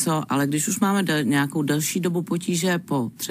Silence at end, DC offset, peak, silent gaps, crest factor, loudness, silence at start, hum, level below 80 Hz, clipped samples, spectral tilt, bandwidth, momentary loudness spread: 0 s; under 0.1%; -6 dBFS; none; 16 dB; -23 LUFS; 0 s; none; -68 dBFS; under 0.1%; -4.5 dB/octave; 16 kHz; 4 LU